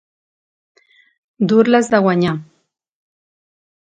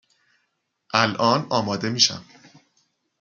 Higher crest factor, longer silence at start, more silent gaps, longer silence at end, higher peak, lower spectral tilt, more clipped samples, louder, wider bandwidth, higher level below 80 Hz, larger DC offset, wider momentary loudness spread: second, 18 dB vs 24 dB; first, 1.4 s vs 0.95 s; neither; first, 1.45 s vs 0.95 s; about the same, 0 dBFS vs -2 dBFS; first, -6.5 dB/octave vs -3 dB/octave; neither; first, -15 LUFS vs -21 LUFS; second, 9.4 kHz vs 11.5 kHz; first, -60 dBFS vs -68 dBFS; neither; first, 9 LU vs 6 LU